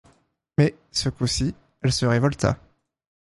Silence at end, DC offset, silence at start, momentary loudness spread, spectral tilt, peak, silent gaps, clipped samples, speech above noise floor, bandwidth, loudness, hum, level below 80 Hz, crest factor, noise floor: 0.7 s; under 0.1%; 0.6 s; 7 LU; -5 dB/octave; -4 dBFS; none; under 0.1%; 40 dB; 11.5 kHz; -24 LUFS; none; -44 dBFS; 20 dB; -62 dBFS